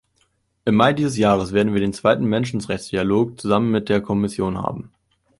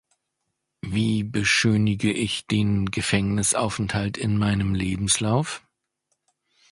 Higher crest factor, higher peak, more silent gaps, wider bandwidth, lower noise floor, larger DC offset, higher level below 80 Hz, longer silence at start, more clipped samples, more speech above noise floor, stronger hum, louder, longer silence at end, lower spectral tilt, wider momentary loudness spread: about the same, 18 dB vs 20 dB; first, -2 dBFS vs -6 dBFS; neither; about the same, 11.5 kHz vs 11.5 kHz; second, -66 dBFS vs -79 dBFS; neither; about the same, -48 dBFS vs -44 dBFS; second, 0.65 s vs 0.85 s; neither; second, 46 dB vs 56 dB; neither; first, -20 LUFS vs -23 LUFS; second, 0.5 s vs 1.15 s; first, -6.5 dB/octave vs -4.5 dB/octave; first, 9 LU vs 6 LU